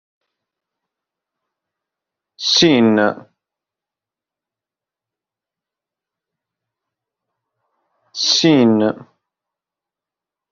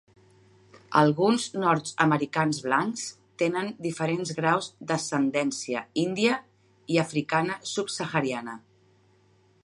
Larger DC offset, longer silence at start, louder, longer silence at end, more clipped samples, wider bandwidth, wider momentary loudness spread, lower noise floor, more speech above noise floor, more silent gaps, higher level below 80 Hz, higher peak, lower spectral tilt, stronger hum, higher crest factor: neither; first, 2.4 s vs 0.75 s; first, -14 LUFS vs -26 LUFS; first, 1.55 s vs 1.05 s; neither; second, 7.4 kHz vs 11.5 kHz; first, 18 LU vs 8 LU; first, -88 dBFS vs -62 dBFS; first, 74 dB vs 36 dB; neither; first, -64 dBFS vs -72 dBFS; first, 0 dBFS vs -6 dBFS; second, -3.5 dB/octave vs -5 dB/octave; neither; about the same, 20 dB vs 22 dB